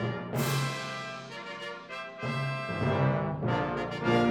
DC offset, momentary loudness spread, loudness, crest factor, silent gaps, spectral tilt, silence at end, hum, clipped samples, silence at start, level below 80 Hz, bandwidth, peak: under 0.1%; 12 LU; -32 LUFS; 16 dB; none; -6 dB/octave; 0 s; none; under 0.1%; 0 s; -58 dBFS; 19 kHz; -14 dBFS